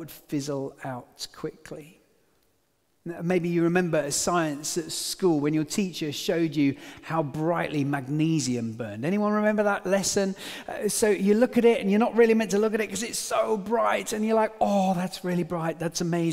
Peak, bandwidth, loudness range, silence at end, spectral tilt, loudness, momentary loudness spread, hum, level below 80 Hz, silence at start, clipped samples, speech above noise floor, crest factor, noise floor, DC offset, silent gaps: -8 dBFS; 16 kHz; 5 LU; 0 s; -5 dB/octave; -25 LUFS; 14 LU; none; -62 dBFS; 0 s; under 0.1%; 45 dB; 18 dB; -71 dBFS; under 0.1%; none